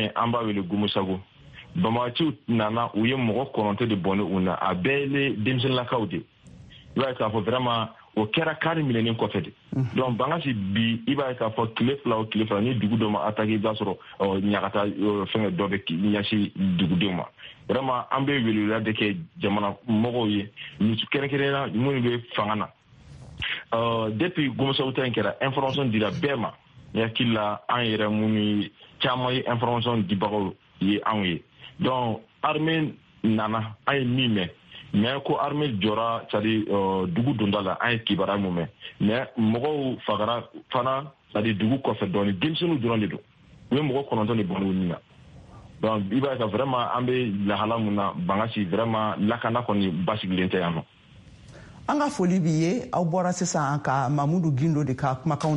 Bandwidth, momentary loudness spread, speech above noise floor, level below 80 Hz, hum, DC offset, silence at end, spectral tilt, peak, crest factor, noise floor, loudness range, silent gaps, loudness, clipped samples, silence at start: 10 kHz; 5 LU; 25 dB; -58 dBFS; none; under 0.1%; 0 s; -6.5 dB/octave; -8 dBFS; 18 dB; -50 dBFS; 2 LU; none; -25 LUFS; under 0.1%; 0 s